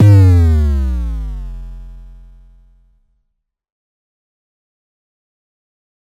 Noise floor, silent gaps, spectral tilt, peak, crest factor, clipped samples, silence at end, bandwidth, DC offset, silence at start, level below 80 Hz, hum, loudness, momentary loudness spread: -70 dBFS; none; -9 dB/octave; -2 dBFS; 14 dB; under 0.1%; 4.1 s; 7.4 kHz; under 0.1%; 0 s; -24 dBFS; none; -13 LUFS; 25 LU